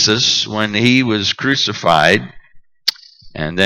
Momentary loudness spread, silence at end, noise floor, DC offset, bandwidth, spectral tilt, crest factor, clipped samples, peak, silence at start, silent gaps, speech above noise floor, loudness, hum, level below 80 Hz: 11 LU; 0 s; -40 dBFS; under 0.1%; 16.5 kHz; -3.5 dB/octave; 16 dB; under 0.1%; 0 dBFS; 0 s; none; 25 dB; -14 LUFS; none; -48 dBFS